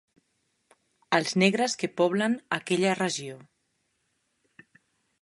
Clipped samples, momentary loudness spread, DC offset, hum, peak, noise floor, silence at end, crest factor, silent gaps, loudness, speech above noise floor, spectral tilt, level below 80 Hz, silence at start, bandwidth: under 0.1%; 7 LU; under 0.1%; none; -6 dBFS; -75 dBFS; 1.85 s; 24 dB; none; -26 LUFS; 49 dB; -4.5 dB/octave; -74 dBFS; 1.1 s; 11.5 kHz